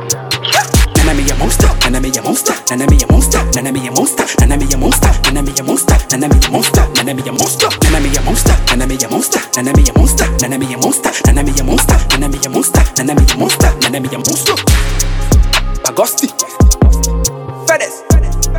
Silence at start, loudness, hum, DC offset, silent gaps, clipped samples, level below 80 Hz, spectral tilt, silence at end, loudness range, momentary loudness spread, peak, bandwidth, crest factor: 0 s; -12 LUFS; none; under 0.1%; none; under 0.1%; -14 dBFS; -4 dB/octave; 0 s; 1 LU; 5 LU; 0 dBFS; 17.5 kHz; 10 dB